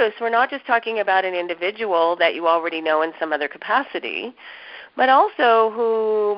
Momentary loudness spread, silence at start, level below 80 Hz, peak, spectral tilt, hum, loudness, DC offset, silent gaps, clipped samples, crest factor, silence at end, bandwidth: 12 LU; 0 s; -68 dBFS; -4 dBFS; -7.5 dB/octave; none; -20 LUFS; under 0.1%; none; under 0.1%; 16 dB; 0 s; 5.6 kHz